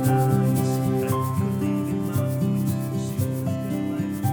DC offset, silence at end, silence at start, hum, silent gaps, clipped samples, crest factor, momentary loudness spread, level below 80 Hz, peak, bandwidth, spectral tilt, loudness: under 0.1%; 0 s; 0 s; none; none; under 0.1%; 14 dB; 6 LU; -54 dBFS; -10 dBFS; over 20 kHz; -7.5 dB/octave; -24 LUFS